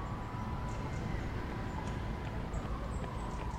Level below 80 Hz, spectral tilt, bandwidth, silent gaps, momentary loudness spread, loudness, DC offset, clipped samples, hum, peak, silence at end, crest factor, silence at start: -42 dBFS; -6.5 dB/octave; 13.5 kHz; none; 2 LU; -40 LUFS; under 0.1%; under 0.1%; none; -26 dBFS; 0 s; 12 dB; 0 s